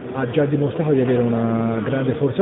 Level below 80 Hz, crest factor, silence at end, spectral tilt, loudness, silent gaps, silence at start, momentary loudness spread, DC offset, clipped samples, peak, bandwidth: -52 dBFS; 14 dB; 0 s; -13 dB/octave; -20 LUFS; none; 0 s; 4 LU; under 0.1%; under 0.1%; -4 dBFS; 4 kHz